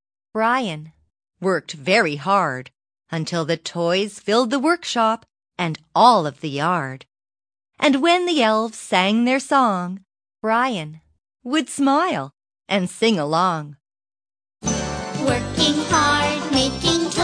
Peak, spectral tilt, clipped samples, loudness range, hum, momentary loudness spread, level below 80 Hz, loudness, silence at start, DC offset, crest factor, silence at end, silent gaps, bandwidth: -2 dBFS; -4 dB/octave; under 0.1%; 3 LU; none; 12 LU; -48 dBFS; -20 LUFS; 0.35 s; under 0.1%; 20 dB; 0 s; none; 10.5 kHz